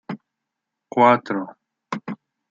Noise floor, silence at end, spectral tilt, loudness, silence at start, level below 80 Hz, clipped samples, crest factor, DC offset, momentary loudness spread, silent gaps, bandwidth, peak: -82 dBFS; 0.4 s; -7 dB/octave; -20 LUFS; 0.1 s; -74 dBFS; under 0.1%; 20 dB; under 0.1%; 21 LU; none; 7.6 kHz; -2 dBFS